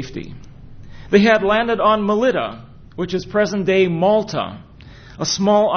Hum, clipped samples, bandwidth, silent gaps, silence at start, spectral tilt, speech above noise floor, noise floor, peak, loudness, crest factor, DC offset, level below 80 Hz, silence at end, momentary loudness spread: none; under 0.1%; 6.6 kHz; none; 0 s; -5 dB/octave; 23 dB; -40 dBFS; 0 dBFS; -17 LUFS; 18 dB; under 0.1%; -46 dBFS; 0 s; 17 LU